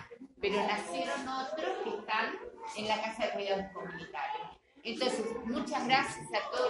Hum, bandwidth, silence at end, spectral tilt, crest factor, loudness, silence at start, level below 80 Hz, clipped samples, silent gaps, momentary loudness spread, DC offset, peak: none; 11.5 kHz; 0 s; -3.5 dB/octave; 24 dB; -35 LUFS; 0 s; -68 dBFS; under 0.1%; none; 12 LU; under 0.1%; -12 dBFS